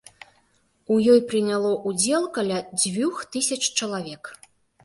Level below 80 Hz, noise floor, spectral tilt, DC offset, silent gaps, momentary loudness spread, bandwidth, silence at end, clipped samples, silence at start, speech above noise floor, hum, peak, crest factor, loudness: -66 dBFS; -64 dBFS; -3.5 dB/octave; under 0.1%; none; 13 LU; 12 kHz; 0.5 s; under 0.1%; 0.9 s; 42 dB; none; -6 dBFS; 18 dB; -22 LUFS